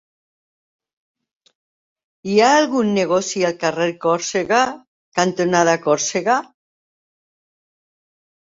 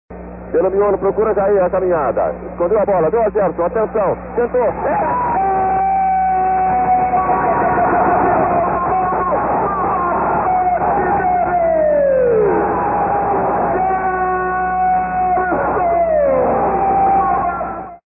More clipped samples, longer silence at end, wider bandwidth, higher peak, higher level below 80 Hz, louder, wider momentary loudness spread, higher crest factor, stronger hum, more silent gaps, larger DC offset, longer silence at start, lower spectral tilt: neither; first, 2.05 s vs 0.1 s; first, 7.8 kHz vs 2.8 kHz; about the same, -2 dBFS vs -4 dBFS; second, -64 dBFS vs -38 dBFS; about the same, -18 LUFS vs -16 LUFS; first, 7 LU vs 4 LU; first, 18 dB vs 12 dB; neither; first, 4.87-5.12 s vs none; neither; first, 2.25 s vs 0.1 s; second, -4 dB/octave vs -15 dB/octave